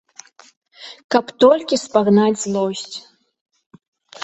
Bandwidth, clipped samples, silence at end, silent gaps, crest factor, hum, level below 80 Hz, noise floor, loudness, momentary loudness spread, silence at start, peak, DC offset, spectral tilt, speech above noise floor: 8.2 kHz; under 0.1%; 0 s; 1.04-1.09 s, 3.41-3.46 s, 3.66-3.70 s, 3.88-3.93 s; 18 dB; none; -62 dBFS; -45 dBFS; -17 LUFS; 22 LU; 0.8 s; -2 dBFS; under 0.1%; -5 dB/octave; 29 dB